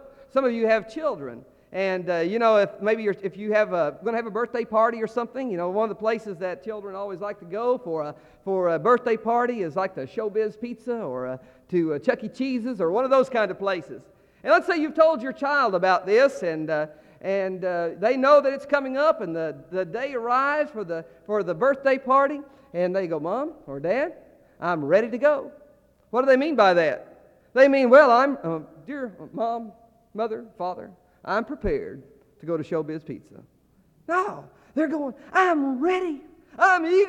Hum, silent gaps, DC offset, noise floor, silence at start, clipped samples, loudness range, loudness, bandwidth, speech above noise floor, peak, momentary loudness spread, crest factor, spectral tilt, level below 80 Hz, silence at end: none; none; under 0.1%; -60 dBFS; 0.05 s; under 0.1%; 10 LU; -24 LUFS; 9.2 kHz; 37 dB; -4 dBFS; 15 LU; 20 dB; -6 dB/octave; -56 dBFS; 0 s